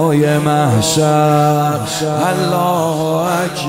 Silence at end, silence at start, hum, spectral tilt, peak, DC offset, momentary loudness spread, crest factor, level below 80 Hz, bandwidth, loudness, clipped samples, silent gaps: 0 s; 0 s; none; -5.5 dB/octave; -2 dBFS; under 0.1%; 5 LU; 12 dB; -48 dBFS; 16 kHz; -14 LUFS; under 0.1%; none